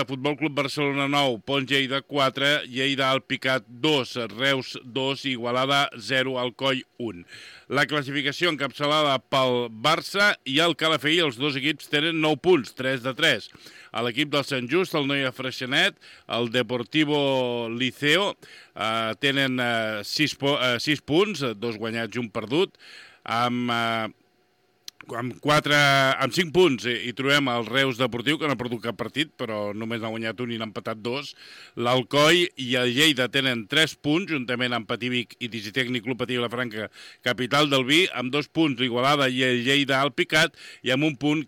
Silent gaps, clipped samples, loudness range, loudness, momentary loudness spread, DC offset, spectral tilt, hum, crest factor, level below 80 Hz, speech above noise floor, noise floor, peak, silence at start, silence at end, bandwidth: none; under 0.1%; 5 LU; -23 LUFS; 10 LU; under 0.1%; -4 dB/octave; none; 18 dB; -66 dBFS; 41 dB; -66 dBFS; -6 dBFS; 0 s; 0 s; 18 kHz